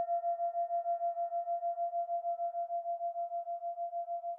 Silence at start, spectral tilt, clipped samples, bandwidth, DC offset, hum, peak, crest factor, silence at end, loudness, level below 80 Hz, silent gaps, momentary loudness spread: 0 s; 0 dB/octave; under 0.1%; 1.9 kHz; under 0.1%; none; -28 dBFS; 8 dB; 0 s; -36 LUFS; under -90 dBFS; none; 5 LU